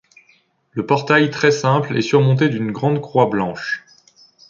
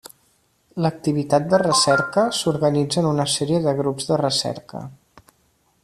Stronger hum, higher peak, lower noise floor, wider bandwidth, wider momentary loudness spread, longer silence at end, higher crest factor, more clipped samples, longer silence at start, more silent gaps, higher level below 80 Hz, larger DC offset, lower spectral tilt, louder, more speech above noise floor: neither; about the same, -2 dBFS vs -4 dBFS; second, -58 dBFS vs -63 dBFS; second, 7.4 kHz vs 14 kHz; second, 11 LU vs 14 LU; second, 0.7 s vs 0.9 s; about the same, 16 dB vs 18 dB; neither; about the same, 0.75 s vs 0.75 s; neither; about the same, -58 dBFS vs -58 dBFS; neither; first, -6.5 dB/octave vs -4.5 dB/octave; first, -17 LUFS vs -20 LUFS; about the same, 41 dB vs 43 dB